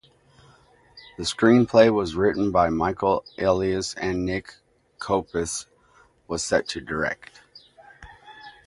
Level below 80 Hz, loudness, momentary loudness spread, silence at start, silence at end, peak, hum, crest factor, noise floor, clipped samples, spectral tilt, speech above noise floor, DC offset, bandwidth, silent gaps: -48 dBFS; -23 LUFS; 15 LU; 0.95 s; 0.15 s; 0 dBFS; none; 24 dB; -58 dBFS; under 0.1%; -5 dB/octave; 36 dB; under 0.1%; 11.5 kHz; none